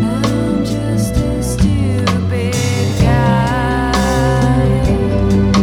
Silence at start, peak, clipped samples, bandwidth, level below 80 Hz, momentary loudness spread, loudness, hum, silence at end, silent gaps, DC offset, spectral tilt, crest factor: 0 s; 0 dBFS; under 0.1%; 16 kHz; -22 dBFS; 4 LU; -15 LUFS; none; 0 s; none; under 0.1%; -6.5 dB/octave; 12 dB